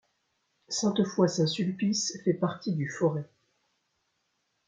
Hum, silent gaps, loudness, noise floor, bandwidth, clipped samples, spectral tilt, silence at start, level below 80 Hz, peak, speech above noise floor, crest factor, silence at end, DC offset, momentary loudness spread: none; none; -29 LUFS; -77 dBFS; 9.4 kHz; under 0.1%; -5 dB/octave; 0.7 s; -72 dBFS; -12 dBFS; 49 dB; 18 dB; 1.4 s; under 0.1%; 7 LU